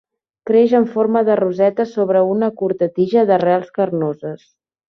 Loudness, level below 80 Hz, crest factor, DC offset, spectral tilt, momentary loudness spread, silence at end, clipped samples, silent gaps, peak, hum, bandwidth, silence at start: -16 LUFS; -64 dBFS; 14 dB; under 0.1%; -8.5 dB/octave; 9 LU; 0.55 s; under 0.1%; none; -2 dBFS; none; 6.4 kHz; 0.45 s